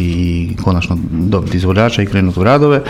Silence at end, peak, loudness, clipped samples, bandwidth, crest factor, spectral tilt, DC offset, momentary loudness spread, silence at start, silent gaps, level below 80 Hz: 0 s; 0 dBFS; -13 LUFS; under 0.1%; 12 kHz; 12 dB; -7.5 dB/octave; under 0.1%; 6 LU; 0 s; none; -30 dBFS